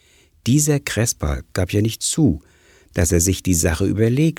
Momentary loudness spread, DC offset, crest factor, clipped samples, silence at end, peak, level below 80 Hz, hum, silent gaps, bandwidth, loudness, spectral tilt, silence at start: 8 LU; under 0.1%; 16 dB; under 0.1%; 0.05 s; -2 dBFS; -34 dBFS; none; none; 19.5 kHz; -19 LUFS; -5 dB/octave; 0.45 s